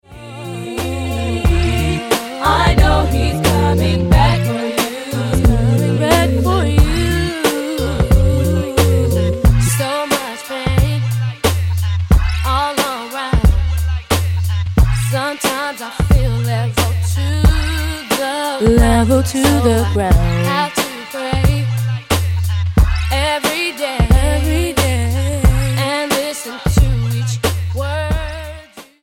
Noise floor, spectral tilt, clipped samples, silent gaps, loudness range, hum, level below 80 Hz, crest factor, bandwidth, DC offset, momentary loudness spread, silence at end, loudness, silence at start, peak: -36 dBFS; -5.5 dB/octave; under 0.1%; none; 2 LU; none; -20 dBFS; 14 dB; 17 kHz; under 0.1%; 7 LU; 0.2 s; -16 LUFS; 0.1 s; 0 dBFS